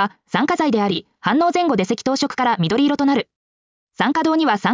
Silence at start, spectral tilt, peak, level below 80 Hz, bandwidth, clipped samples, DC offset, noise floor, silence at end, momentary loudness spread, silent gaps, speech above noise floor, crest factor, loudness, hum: 0 s; -5.5 dB/octave; -4 dBFS; -60 dBFS; 7.6 kHz; under 0.1%; under 0.1%; under -90 dBFS; 0 s; 5 LU; 3.36-3.87 s; over 72 dB; 14 dB; -18 LUFS; none